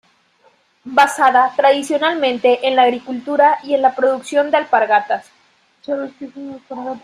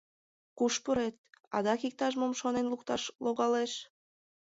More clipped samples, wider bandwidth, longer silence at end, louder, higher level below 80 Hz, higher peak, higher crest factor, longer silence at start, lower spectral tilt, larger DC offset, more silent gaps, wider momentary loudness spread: neither; first, 14.5 kHz vs 8 kHz; second, 0.05 s vs 0.65 s; first, -15 LUFS vs -33 LUFS; about the same, -68 dBFS vs -68 dBFS; first, -2 dBFS vs -16 dBFS; about the same, 16 dB vs 16 dB; first, 0.85 s vs 0.55 s; about the same, -2.5 dB/octave vs -3.5 dB/octave; neither; second, none vs 1.18-1.24 s, 1.47-1.51 s, 3.15-3.19 s; first, 16 LU vs 7 LU